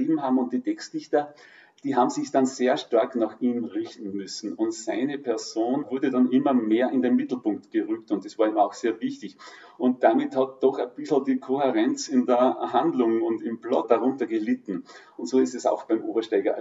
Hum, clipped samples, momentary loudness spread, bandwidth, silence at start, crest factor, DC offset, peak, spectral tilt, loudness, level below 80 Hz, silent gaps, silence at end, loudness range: none; under 0.1%; 11 LU; 7.8 kHz; 0 s; 20 dB; under 0.1%; -6 dBFS; -5 dB/octave; -25 LUFS; under -90 dBFS; none; 0 s; 3 LU